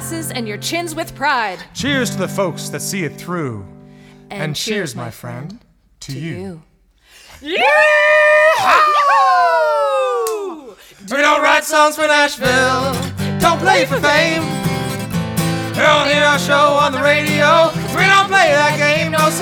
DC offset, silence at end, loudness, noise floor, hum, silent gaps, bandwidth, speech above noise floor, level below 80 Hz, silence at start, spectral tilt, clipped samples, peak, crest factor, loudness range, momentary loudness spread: under 0.1%; 0 s; -14 LUFS; -49 dBFS; none; none; over 20 kHz; 34 dB; -48 dBFS; 0 s; -4 dB/octave; under 0.1%; 0 dBFS; 16 dB; 13 LU; 15 LU